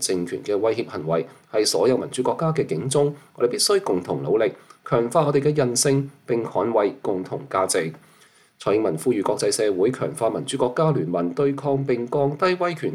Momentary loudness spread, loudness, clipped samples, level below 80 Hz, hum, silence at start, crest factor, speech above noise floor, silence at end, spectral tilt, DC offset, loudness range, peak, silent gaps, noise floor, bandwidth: 6 LU; -22 LUFS; under 0.1%; -64 dBFS; none; 0 s; 16 dB; 33 dB; 0 s; -4.5 dB/octave; under 0.1%; 2 LU; -6 dBFS; none; -55 dBFS; 14 kHz